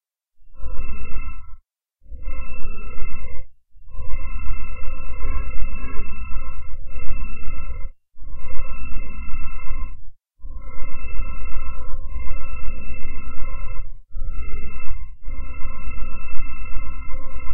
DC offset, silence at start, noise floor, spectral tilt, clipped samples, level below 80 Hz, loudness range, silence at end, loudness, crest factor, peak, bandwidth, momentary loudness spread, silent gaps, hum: 6%; 0 s; -51 dBFS; -11.5 dB/octave; under 0.1%; -26 dBFS; 3 LU; 0 s; -36 LUFS; 10 dB; 0 dBFS; 2.9 kHz; 8 LU; none; none